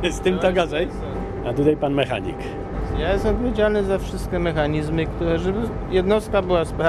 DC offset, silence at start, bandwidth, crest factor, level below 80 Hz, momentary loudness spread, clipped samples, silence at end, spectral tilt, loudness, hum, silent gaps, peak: under 0.1%; 0 s; 13 kHz; 16 dB; -32 dBFS; 8 LU; under 0.1%; 0 s; -6.5 dB/octave; -22 LUFS; none; none; -4 dBFS